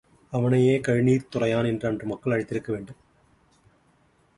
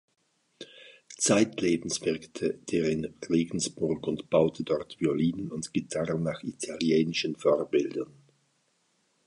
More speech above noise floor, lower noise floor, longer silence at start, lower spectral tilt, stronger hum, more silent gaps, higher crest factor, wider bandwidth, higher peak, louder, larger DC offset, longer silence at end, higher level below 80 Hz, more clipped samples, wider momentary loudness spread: second, 39 dB vs 44 dB; second, -63 dBFS vs -72 dBFS; second, 0.3 s vs 0.6 s; first, -7.5 dB/octave vs -4.5 dB/octave; neither; neither; about the same, 16 dB vs 20 dB; about the same, 11.5 kHz vs 11.5 kHz; about the same, -10 dBFS vs -10 dBFS; first, -25 LUFS vs -29 LUFS; neither; first, 1.45 s vs 1.2 s; about the same, -58 dBFS vs -62 dBFS; neither; about the same, 12 LU vs 11 LU